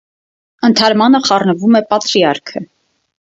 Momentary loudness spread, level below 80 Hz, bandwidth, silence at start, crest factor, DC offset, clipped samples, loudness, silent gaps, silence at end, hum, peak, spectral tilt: 10 LU; -58 dBFS; 7.8 kHz; 0.6 s; 14 dB; under 0.1%; under 0.1%; -12 LUFS; none; 0.65 s; none; 0 dBFS; -4.5 dB/octave